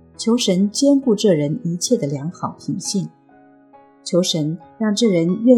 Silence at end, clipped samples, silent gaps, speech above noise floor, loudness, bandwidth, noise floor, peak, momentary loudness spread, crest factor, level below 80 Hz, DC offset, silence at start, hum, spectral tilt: 0 s; under 0.1%; none; 32 dB; -19 LUFS; 14.5 kHz; -49 dBFS; 0 dBFS; 10 LU; 18 dB; -66 dBFS; under 0.1%; 0.2 s; none; -5 dB/octave